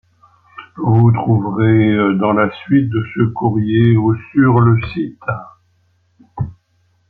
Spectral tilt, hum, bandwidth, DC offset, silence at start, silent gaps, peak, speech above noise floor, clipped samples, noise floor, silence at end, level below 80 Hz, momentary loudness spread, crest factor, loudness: -11.5 dB/octave; none; 4.3 kHz; under 0.1%; 0.6 s; none; -2 dBFS; 46 dB; under 0.1%; -59 dBFS; 0.55 s; -46 dBFS; 14 LU; 14 dB; -14 LUFS